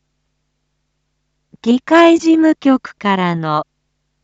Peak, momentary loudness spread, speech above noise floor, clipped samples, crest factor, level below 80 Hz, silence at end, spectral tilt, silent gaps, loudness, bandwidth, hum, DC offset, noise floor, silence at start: 0 dBFS; 11 LU; 56 dB; under 0.1%; 16 dB; -62 dBFS; 0.6 s; -6 dB/octave; none; -13 LUFS; 8 kHz; none; under 0.1%; -69 dBFS; 1.65 s